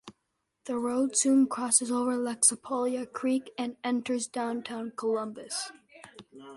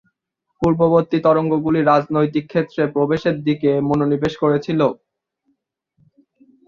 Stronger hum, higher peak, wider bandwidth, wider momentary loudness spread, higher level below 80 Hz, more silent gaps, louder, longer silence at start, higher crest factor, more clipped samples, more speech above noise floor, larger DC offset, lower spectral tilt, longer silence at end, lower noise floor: neither; second, -8 dBFS vs -2 dBFS; first, 11.5 kHz vs 7.2 kHz; first, 11 LU vs 5 LU; second, -74 dBFS vs -50 dBFS; neither; second, -28 LUFS vs -18 LUFS; second, 0.05 s vs 0.6 s; first, 22 dB vs 16 dB; neither; second, 51 dB vs 58 dB; neither; second, -2 dB/octave vs -8.5 dB/octave; second, 0 s vs 1.75 s; first, -80 dBFS vs -75 dBFS